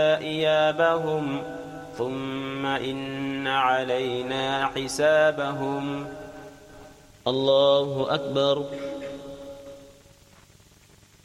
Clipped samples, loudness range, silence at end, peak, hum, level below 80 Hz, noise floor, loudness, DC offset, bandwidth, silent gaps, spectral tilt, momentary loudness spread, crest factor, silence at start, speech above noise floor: under 0.1%; 3 LU; 1.35 s; -8 dBFS; none; -58 dBFS; -55 dBFS; -25 LUFS; under 0.1%; 14 kHz; none; -4.5 dB/octave; 19 LU; 18 dB; 0 s; 30 dB